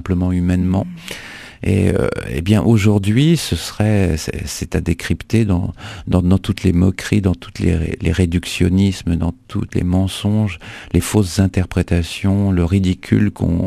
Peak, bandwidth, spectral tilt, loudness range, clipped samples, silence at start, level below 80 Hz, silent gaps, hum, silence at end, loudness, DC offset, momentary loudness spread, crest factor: 0 dBFS; 14 kHz; -6.5 dB/octave; 2 LU; under 0.1%; 0 s; -32 dBFS; none; none; 0 s; -17 LUFS; under 0.1%; 8 LU; 16 dB